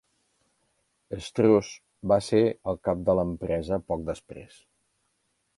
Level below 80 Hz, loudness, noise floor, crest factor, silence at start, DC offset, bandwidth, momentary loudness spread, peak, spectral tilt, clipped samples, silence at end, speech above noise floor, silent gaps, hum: -50 dBFS; -26 LUFS; -75 dBFS; 20 dB; 1.1 s; under 0.1%; 11.5 kHz; 17 LU; -8 dBFS; -7 dB/octave; under 0.1%; 1.1 s; 49 dB; none; none